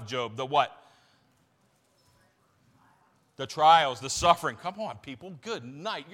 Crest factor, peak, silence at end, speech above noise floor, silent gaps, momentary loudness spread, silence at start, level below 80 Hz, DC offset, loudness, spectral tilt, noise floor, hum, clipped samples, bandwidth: 24 dB; -6 dBFS; 0.1 s; 41 dB; none; 19 LU; 0 s; -60 dBFS; under 0.1%; -27 LUFS; -3 dB/octave; -68 dBFS; none; under 0.1%; 16.5 kHz